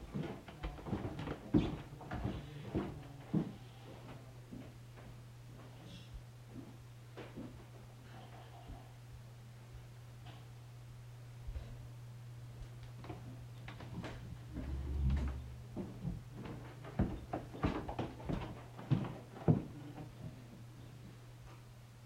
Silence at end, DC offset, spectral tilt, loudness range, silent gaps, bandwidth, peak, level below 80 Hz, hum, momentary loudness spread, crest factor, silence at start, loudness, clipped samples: 0 s; under 0.1%; -7.5 dB/octave; 13 LU; none; 16 kHz; -16 dBFS; -52 dBFS; none; 16 LU; 26 dB; 0 s; -44 LUFS; under 0.1%